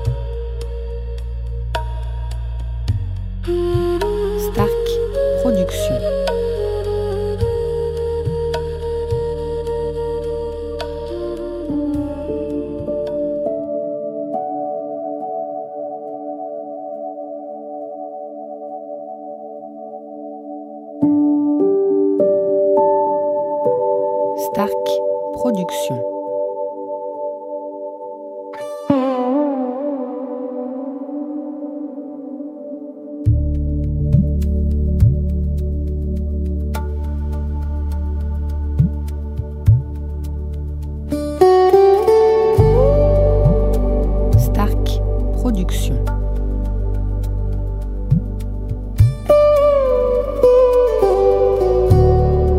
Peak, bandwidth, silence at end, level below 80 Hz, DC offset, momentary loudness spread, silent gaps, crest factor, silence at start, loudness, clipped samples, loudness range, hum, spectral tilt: 0 dBFS; 16 kHz; 0 s; -24 dBFS; under 0.1%; 16 LU; none; 18 dB; 0 s; -19 LUFS; under 0.1%; 12 LU; none; -8 dB/octave